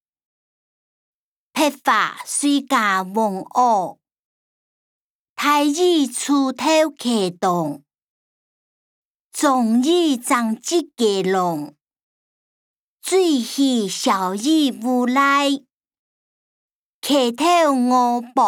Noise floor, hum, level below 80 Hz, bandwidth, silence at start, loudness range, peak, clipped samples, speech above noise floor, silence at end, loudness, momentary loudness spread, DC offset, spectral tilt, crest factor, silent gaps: under -90 dBFS; none; -74 dBFS; 19.5 kHz; 1.55 s; 3 LU; -4 dBFS; under 0.1%; over 72 dB; 0 s; -18 LUFS; 7 LU; under 0.1%; -3.5 dB/octave; 16 dB; 4.19-5.36 s, 8.02-9.31 s, 12.02-12.97 s, 15.99-16.69 s, 16.75-17.02 s